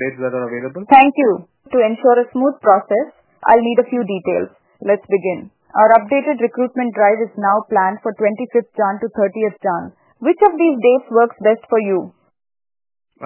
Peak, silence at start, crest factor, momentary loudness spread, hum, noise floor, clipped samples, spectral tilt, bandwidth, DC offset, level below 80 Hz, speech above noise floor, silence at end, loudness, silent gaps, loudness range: 0 dBFS; 0 s; 16 dB; 11 LU; none; under -90 dBFS; under 0.1%; -9.5 dB/octave; 4 kHz; under 0.1%; -62 dBFS; over 75 dB; 0 s; -16 LUFS; none; 3 LU